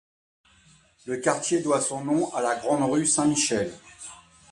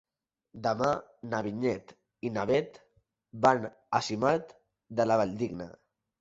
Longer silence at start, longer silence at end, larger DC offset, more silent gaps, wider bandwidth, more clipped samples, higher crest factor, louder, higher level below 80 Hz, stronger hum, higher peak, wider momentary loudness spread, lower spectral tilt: first, 1.05 s vs 0.55 s; second, 0.35 s vs 0.5 s; neither; neither; first, 11.5 kHz vs 8 kHz; neither; about the same, 20 dB vs 22 dB; first, -24 LUFS vs -30 LUFS; about the same, -64 dBFS vs -64 dBFS; neither; about the same, -8 dBFS vs -8 dBFS; first, 20 LU vs 13 LU; second, -3.5 dB/octave vs -6 dB/octave